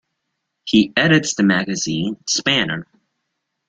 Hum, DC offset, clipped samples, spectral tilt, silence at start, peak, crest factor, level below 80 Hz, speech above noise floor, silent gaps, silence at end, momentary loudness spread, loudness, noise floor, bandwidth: none; under 0.1%; under 0.1%; -3.5 dB/octave; 0.65 s; -2 dBFS; 18 dB; -54 dBFS; 58 dB; none; 0.85 s; 9 LU; -17 LUFS; -76 dBFS; 9.2 kHz